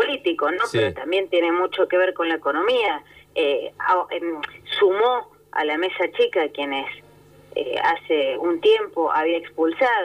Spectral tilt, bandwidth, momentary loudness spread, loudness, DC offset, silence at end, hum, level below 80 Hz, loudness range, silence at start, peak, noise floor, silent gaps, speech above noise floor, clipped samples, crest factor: -5 dB/octave; 14.5 kHz; 9 LU; -22 LUFS; under 0.1%; 0 s; 50 Hz at -60 dBFS; -62 dBFS; 2 LU; 0 s; -8 dBFS; -48 dBFS; none; 26 dB; under 0.1%; 14 dB